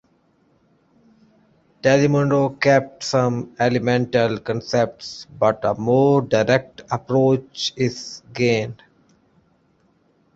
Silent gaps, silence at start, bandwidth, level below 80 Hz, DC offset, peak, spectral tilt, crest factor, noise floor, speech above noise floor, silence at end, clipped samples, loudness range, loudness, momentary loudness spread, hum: none; 1.85 s; 8 kHz; -56 dBFS; under 0.1%; -2 dBFS; -6 dB/octave; 20 dB; -61 dBFS; 42 dB; 1.6 s; under 0.1%; 4 LU; -20 LUFS; 9 LU; none